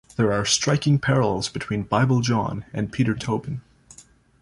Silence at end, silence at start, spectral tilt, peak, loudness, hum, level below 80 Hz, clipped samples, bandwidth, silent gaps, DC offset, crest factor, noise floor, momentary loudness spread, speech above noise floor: 0.4 s; 0.2 s; -5 dB/octave; -6 dBFS; -22 LUFS; none; -50 dBFS; under 0.1%; 11.5 kHz; none; under 0.1%; 18 dB; -51 dBFS; 9 LU; 29 dB